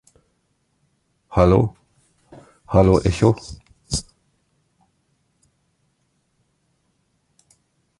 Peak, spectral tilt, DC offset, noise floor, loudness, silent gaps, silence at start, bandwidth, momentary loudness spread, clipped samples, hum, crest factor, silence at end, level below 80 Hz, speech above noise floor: -2 dBFS; -7 dB/octave; under 0.1%; -68 dBFS; -19 LUFS; none; 1.3 s; 11.5 kHz; 12 LU; under 0.1%; none; 22 dB; 4 s; -36 dBFS; 52 dB